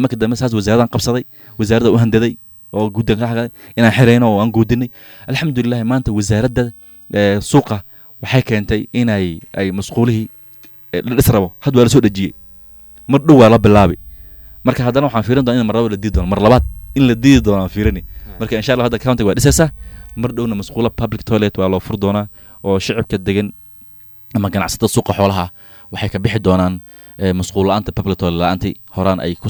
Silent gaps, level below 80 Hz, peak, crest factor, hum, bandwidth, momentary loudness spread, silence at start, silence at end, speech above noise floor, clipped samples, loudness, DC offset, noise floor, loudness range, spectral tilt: none; -32 dBFS; 0 dBFS; 14 dB; none; 19.5 kHz; 12 LU; 0 s; 0 s; 26 dB; under 0.1%; -15 LUFS; under 0.1%; -39 dBFS; 6 LU; -6 dB/octave